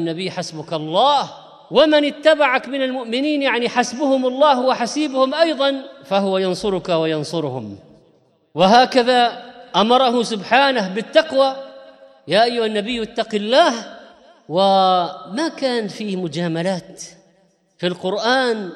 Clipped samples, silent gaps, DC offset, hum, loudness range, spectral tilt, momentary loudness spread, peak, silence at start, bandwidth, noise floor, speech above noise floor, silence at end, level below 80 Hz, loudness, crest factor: under 0.1%; none; under 0.1%; none; 4 LU; -4.5 dB/octave; 12 LU; -2 dBFS; 0 s; 11.5 kHz; -59 dBFS; 41 dB; 0 s; -60 dBFS; -18 LUFS; 18 dB